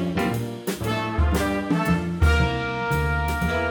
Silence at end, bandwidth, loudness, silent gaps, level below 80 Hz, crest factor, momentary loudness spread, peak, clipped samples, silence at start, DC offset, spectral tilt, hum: 0 s; over 20 kHz; -23 LUFS; none; -28 dBFS; 14 dB; 5 LU; -8 dBFS; under 0.1%; 0 s; under 0.1%; -6 dB/octave; none